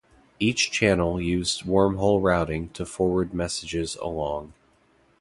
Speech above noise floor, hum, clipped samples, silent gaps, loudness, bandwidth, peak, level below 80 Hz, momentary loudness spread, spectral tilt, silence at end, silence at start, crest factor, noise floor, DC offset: 38 dB; none; under 0.1%; none; -24 LUFS; 11.5 kHz; -6 dBFS; -44 dBFS; 9 LU; -4.5 dB/octave; 0.7 s; 0.4 s; 20 dB; -62 dBFS; under 0.1%